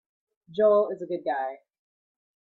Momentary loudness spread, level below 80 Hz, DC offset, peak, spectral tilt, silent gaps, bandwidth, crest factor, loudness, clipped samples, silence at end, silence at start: 13 LU; -76 dBFS; under 0.1%; -10 dBFS; -8 dB/octave; none; 4.4 kHz; 18 dB; -26 LUFS; under 0.1%; 1.05 s; 0.5 s